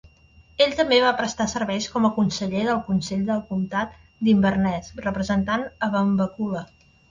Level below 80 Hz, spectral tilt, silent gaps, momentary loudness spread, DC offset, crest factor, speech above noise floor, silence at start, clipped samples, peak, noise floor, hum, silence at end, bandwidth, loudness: -50 dBFS; -5.5 dB/octave; none; 10 LU; under 0.1%; 18 dB; 31 dB; 0.6 s; under 0.1%; -6 dBFS; -53 dBFS; none; 0.45 s; 7.6 kHz; -23 LUFS